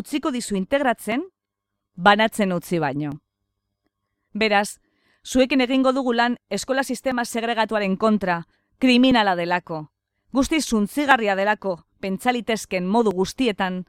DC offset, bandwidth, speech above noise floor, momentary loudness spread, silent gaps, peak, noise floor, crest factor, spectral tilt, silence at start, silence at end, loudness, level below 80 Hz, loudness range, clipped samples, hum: under 0.1%; 16 kHz; 61 dB; 11 LU; none; -2 dBFS; -82 dBFS; 20 dB; -4.5 dB/octave; 0 s; 0.05 s; -21 LUFS; -52 dBFS; 3 LU; under 0.1%; none